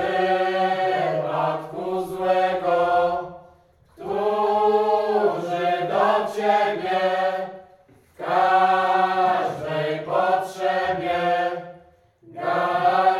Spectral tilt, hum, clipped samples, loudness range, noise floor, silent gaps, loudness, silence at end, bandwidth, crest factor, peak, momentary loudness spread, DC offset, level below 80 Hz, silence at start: -5.5 dB/octave; none; under 0.1%; 3 LU; -55 dBFS; none; -22 LUFS; 0 s; 13 kHz; 16 dB; -6 dBFS; 9 LU; under 0.1%; -64 dBFS; 0 s